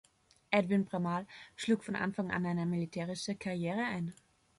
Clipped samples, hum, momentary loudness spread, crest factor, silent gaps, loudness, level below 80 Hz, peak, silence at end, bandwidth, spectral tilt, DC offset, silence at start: under 0.1%; none; 8 LU; 20 dB; none; -35 LUFS; -70 dBFS; -16 dBFS; 0.45 s; 11.5 kHz; -6 dB/octave; under 0.1%; 0.5 s